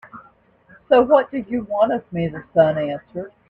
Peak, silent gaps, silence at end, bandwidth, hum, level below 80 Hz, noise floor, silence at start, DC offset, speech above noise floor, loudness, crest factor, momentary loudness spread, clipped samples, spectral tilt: -2 dBFS; none; 0.2 s; 4.4 kHz; none; -54 dBFS; -53 dBFS; 0.05 s; under 0.1%; 34 dB; -19 LUFS; 18 dB; 12 LU; under 0.1%; -9 dB/octave